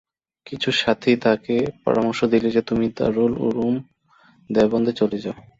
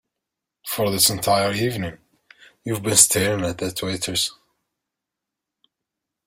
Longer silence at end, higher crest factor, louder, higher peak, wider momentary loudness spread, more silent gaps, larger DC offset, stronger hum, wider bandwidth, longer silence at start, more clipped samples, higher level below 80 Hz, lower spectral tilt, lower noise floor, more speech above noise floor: second, 0.2 s vs 1.95 s; second, 18 dB vs 24 dB; about the same, -21 LUFS vs -20 LUFS; second, -4 dBFS vs 0 dBFS; second, 6 LU vs 15 LU; neither; neither; neither; second, 7.8 kHz vs 16.5 kHz; second, 0.45 s vs 0.65 s; neither; about the same, -52 dBFS vs -56 dBFS; first, -6 dB/octave vs -2.5 dB/octave; second, -56 dBFS vs -85 dBFS; second, 36 dB vs 64 dB